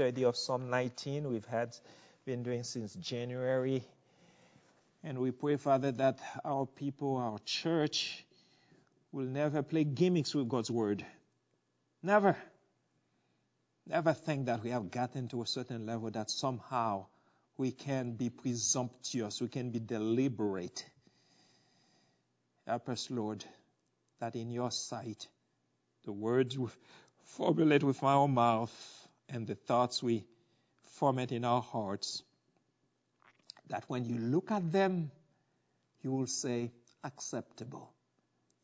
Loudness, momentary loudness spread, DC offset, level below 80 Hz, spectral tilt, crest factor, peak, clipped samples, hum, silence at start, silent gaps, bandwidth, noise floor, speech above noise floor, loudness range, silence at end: -35 LUFS; 14 LU; under 0.1%; -76 dBFS; -5 dB/octave; 22 dB; -14 dBFS; under 0.1%; none; 0 s; none; 8 kHz; -79 dBFS; 45 dB; 8 LU; 0.75 s